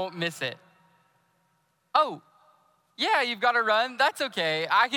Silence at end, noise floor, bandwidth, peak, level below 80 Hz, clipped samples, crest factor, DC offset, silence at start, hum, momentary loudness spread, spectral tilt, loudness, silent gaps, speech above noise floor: 0 s; -71 dBFS; 16 kHz; -8 dBFS; -78 dBFS; under 0.1%; 20 dB; under 0.1%; 0 s; none; 8 LU; -3 dB/octave; -25 LUFS; none; 45 dB